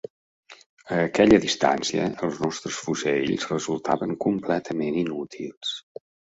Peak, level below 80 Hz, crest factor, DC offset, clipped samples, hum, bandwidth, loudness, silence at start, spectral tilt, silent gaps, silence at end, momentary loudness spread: -4 dBFS; -54 dBFS; 22 dB; under 0.1%; under 0.1%; none; 8 kHz; -24 LUFS; 0.5 s; -4.5 dB/octave; 0.66-0.77 s, 5.57-5.61 s; 0.6 s; 13 LU